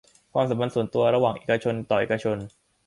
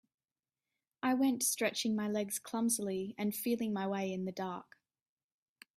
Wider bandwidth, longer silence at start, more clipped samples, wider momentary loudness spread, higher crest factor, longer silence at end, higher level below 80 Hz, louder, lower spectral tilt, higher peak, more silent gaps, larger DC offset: second, 11.5 kHz vs 15.5 kHz; second, 0.35 s vs 1.05 s; neither; about the same, 8 LU vs 8 LU; about the same, 16 dB vs 18 dB; second, 0.4 s vs 1.15 s; first, -60 dBFS vs -80 dBFS; first, -25 LUFS vs -35 LUFS; first, -7 dB/octave vs -3.5 dB/octave; first, -8 dBFS vs -18 dBFS; neither; neither